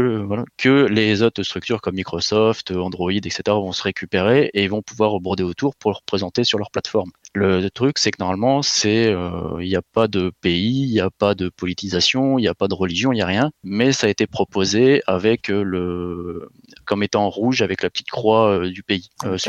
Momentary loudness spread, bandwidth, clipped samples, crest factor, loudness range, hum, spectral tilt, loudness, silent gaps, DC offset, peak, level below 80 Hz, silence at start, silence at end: 8 LU; 8.4 kHz; under 0.1%; 16 dB; 2 LU; none; -5 dB/octave; -19 LUFS; none; under 0.1%; -2 dBFS; -52 dBFS; 0 s; 0 s